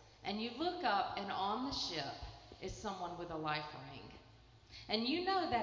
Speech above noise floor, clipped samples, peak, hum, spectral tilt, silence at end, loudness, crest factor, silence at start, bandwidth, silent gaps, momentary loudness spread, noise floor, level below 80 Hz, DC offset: 23 dB; under 0.1%; -20 dBFS; none; -4.5 dB/octave; 0 s; -39 LUFS; 20 dB; 0 s; 7.6 kHz; none; 17 LU; -62 dBFS; -62 dBFS; under 0.1%